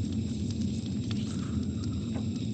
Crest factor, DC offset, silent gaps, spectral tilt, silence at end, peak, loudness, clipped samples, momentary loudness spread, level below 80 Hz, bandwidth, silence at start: 12 dB; under 0.1%; none; -7 dB/octave; 0 s; -20 dBFS; -33 LUFS; under 0.1%; 1 LU; -46 dBFS; 9 kHz; 0 s